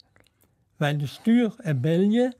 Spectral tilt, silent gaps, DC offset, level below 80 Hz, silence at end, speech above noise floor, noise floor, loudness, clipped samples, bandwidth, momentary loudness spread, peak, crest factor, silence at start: -7.5 dB/octave; none; under 0.1%; -70 dBFS; 0.05 s; 43 dB; -66 dBFS; -24 LUFS; under 0.1%; 13.5 kHz; 6 LU; -10 dBFS; 14 dB; 0.8 s